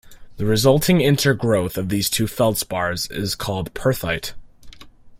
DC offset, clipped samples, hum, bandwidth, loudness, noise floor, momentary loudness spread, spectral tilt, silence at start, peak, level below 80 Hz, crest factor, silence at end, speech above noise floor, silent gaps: under 0.1%; under 0.1%; none; 16.5 kHz; -20 LUFS; -42 dBFS; 9 LU; -5 dB/octave; 0.05 s; -4 dBFS; -42 dBFS; 18 dB; 0.05 s; 22 dB; none